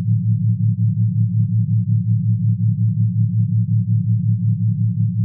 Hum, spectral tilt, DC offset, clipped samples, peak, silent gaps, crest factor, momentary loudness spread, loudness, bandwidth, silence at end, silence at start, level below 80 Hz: none; -20.5 dB/octave; under 0.1%; under 0.1%; -8 dBFS; none; 10 dB; 1 LU; -18 LUFS; 0.2 kHz; 0 s; 0 s; -62 dBFS